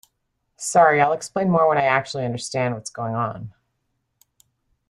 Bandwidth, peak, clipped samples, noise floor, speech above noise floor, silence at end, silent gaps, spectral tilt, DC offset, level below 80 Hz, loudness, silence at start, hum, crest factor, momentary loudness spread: 13 kHz; -2 dBFS; under 0.1%; -74 dBFS; 54 dB; 1.4 s; none; -5 dB/octave; under 0.1%; -60 dBFS; -21 LUFS; 0.6 s; none; 20 dB; 13 LU